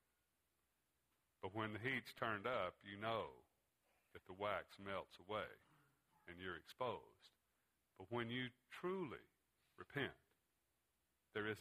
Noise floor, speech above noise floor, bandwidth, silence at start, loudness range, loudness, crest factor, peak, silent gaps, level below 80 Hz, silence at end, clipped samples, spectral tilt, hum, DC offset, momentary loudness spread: -87 dBFS; 39 dB; 15 kHz; 1.45 s; 4 LU; -48 LUFS; 24 dB; -26 dBFS; none; -80 dBFS; 0 s; under 0.1%; -6 dB/octave; none; under 0.1%; 17 LU